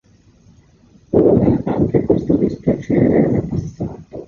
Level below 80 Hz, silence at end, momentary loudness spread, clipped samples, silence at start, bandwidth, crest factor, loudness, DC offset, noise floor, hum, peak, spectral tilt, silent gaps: -38 dBFS; 0 s; 11 LU; under 0.1%; 1.1 s; 7 kHz; 16 dB; -16 LUFS; under 0.1%; -50 dBFS; none; -2 dBFS; -10.5 dB/octave; none